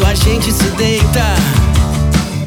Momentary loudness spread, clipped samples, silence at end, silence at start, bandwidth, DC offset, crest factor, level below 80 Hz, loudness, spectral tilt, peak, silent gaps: 2 LU; under 0.1%; 0 s; 0 s; 19.5 kHz; under 0.1%; 10 dB; -18 dBFS; -12 LUFS; -5 dB/octave; 0 dBFS; none